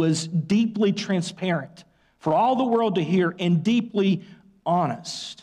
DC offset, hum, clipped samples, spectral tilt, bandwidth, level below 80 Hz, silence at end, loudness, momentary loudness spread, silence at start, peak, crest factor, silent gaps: under 0.1%; none; under 0.1%; -6 dB/octave; 10.5 kHz; -68 dBFS; 0.1 s; -23 LUFS; 9 LU; 0 s; -12 dBFS; 10 dB; none